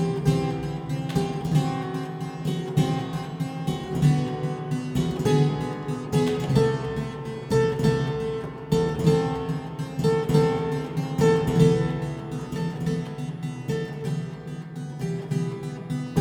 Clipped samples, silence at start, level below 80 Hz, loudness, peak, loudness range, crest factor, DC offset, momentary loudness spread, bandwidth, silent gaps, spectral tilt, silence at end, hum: under 0.1%; 0 s; -48 dBFS; -26 LUFS; -6 dBFS; 7 LU; 18 dB; under 0.1%; 11 LU; 16 kHz; none; -7 dB/octave; 0 s; none